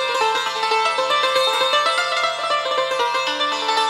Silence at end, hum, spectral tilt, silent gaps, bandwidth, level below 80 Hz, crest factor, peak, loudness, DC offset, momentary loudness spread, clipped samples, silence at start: 0 s; 50 Hz at -60 dBFS; 0 dB/octave; none; 16 kHz; -66 dBFS; 14 dB; -6 dBFS; -18 LUFS; under 0.1%; 3 LU; under 0.1%; 0 s